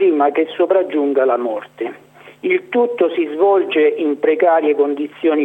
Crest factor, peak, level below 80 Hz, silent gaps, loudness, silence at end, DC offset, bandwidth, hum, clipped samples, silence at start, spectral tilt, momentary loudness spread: 14 dB; -2 dBFS; -78 dBFS; none; -16 LUFS; 0 s; under 0.1%; 4 kHz; 50 Hz at -60 dBFS; under 0.1%; 0 s; -6.5 dB/octave; 10 LU